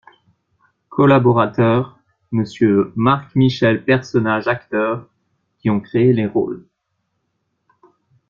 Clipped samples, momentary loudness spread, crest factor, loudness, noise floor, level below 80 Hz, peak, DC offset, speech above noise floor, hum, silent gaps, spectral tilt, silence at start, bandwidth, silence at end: under 0.1%; 11 LU; 16 dB; -17 LUFS; -72 dBFS; -54 dBFS; -2 dBFS; under 0.1%; 56 dB; none; none; -8 dB/octave; 0.9 s; 7.2 kHz; 1.7 s